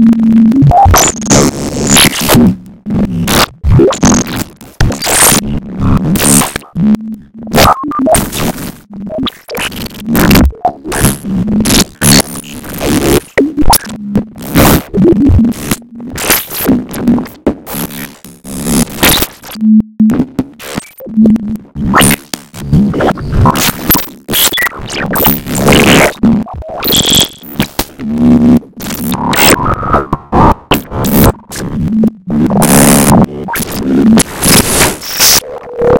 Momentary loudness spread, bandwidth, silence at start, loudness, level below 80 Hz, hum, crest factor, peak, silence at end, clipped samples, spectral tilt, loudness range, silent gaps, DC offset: 12 LU; over 20 kHz; 0 s; -9 LUFS; -22 dBFS; none; 10 dB; 0 dBFS; 0 s; 0.3%; -4 dB/octave; 4 LU; none; under 0.1%